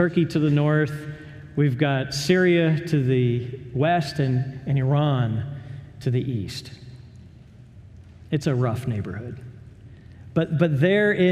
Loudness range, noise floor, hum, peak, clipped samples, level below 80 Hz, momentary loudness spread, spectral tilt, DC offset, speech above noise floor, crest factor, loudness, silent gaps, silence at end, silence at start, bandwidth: 8 LU; -46 dBFS; none; -6 dBFS; under 0.1%; -54 dBFS; 18 LU; -7 dB/octave; under 0.1%; 25 dB; 18 dB; -23 LUFS; none; 0 s; 0 s; 13.5 kHz